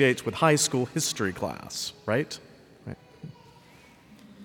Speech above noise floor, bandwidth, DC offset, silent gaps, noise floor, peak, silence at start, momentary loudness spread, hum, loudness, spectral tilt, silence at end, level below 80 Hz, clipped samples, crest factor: 28 dB; 19 kHz; under 0.1%; none; -54 dBFS; -8 dBFS; 0 s; 23 LU; none; -27 LUFS; -3.5 dB/octave; 0 s; -64 dBFS; under 0.1%; 20 dB